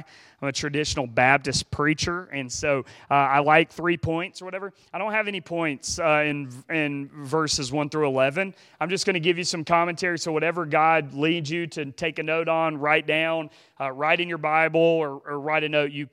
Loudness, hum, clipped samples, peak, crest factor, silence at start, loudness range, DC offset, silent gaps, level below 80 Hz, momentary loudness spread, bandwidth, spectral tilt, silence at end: -24 LUFS; none; under 0.1%; -2 dBFS; 22 dB; 0 s; 3 LU; under 0.1%; none; -54 dBFS; 11 LU; 14 kHz; -4 dB/octave; 0.05 s